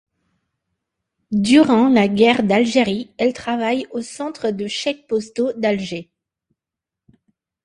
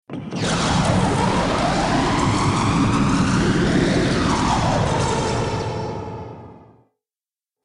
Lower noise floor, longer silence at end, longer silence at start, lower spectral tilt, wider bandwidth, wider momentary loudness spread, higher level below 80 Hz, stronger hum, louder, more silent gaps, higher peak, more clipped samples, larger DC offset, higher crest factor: second, -86 dBFS vs under -90 dBFS; first, 1.6 s vs 1.05 s; first, 1.3 s vs 0.1 s; about the same, -5 dB/octave vs -5.5 dB/octave; about the same, 11 kHz vs 11 kHz; about the same, 11 LU vs 10 LU; second, -58 dBFS vs -34 dBFS; neither; about the same, -18 LUFS vs -19 LUFS; neither; first, 0 dBFS vs -6 dBFS; neither; neither; about the same, 18 dB vs 14 dB